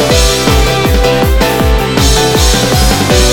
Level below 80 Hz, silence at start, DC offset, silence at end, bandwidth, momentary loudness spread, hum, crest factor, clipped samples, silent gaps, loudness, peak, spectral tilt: -14 dBFS; 0 s; under 0.1%; 0 s; 18.5 kHz; 2 LU; none; 8 dB; 0.7%; none; -9 LUFS; 0 dBFS; -4 dB/octave